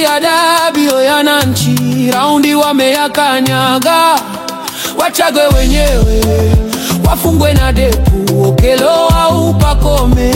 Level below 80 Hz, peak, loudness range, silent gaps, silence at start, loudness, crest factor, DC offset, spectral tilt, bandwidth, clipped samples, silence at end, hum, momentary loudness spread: -16 dBFS; 0 dBFS; 1 LU; none; 0 s; -10 LUFS; 10 dB; under 0.1%; -5 dB/octave; 17 kHz; under 0.1%; 0 s; none; 4 LU